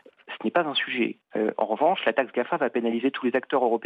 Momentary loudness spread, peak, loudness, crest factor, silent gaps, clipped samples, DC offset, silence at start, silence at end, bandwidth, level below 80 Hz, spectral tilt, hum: 5 LU; -8 dBFS; -25 LUFS; 16 dB; none; under 0.1%; under 0.1%; 0.3 s; 0 s; 5 kHz; -82 dBFS; -7 dB/octave; none